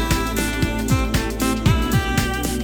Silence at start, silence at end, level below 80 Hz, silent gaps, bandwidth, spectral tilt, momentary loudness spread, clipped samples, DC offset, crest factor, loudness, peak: 0 s; 0 s; -26 dBFS; none; over 20 kHz; -5 dB/octave; 3 LU; under 0.1%; under 0.1%; 16 dB; -20 LUFS; -4 dBFS